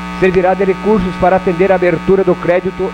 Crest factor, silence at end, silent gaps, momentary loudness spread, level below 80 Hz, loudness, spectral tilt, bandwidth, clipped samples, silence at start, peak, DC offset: 12 dB; 0 s; none; 3 LU; -34 dBFS; -12 LUFS; -8 dB/octave; 9.2 kHz; under 0.1%; 0 s; 0 dBFS; under 0.1%